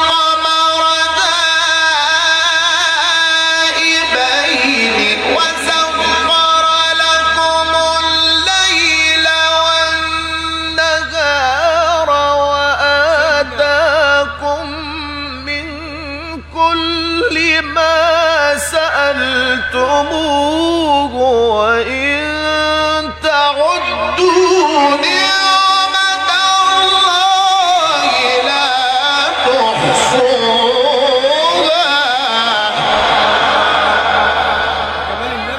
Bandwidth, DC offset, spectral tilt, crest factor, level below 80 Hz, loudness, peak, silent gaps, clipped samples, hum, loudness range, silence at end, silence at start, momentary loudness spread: 16 kHz; under 0.1%; -2 dB/octave; 12 dB; -38 dBFS; -11 LUFS; 0 dBFS; none; under 0.1%; none; 3 LU; 0 s; 0 s; 6 LU